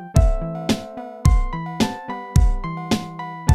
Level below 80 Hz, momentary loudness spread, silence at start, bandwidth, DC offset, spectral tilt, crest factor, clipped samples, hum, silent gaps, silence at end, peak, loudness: -22 dBFS; 9 LU; 0 s; 14.5 kHz; under 0.1%; -6 dB/octave; 16 dB; under 0.1%; none; none; 0 s; -2 dBFS; -23 LUFS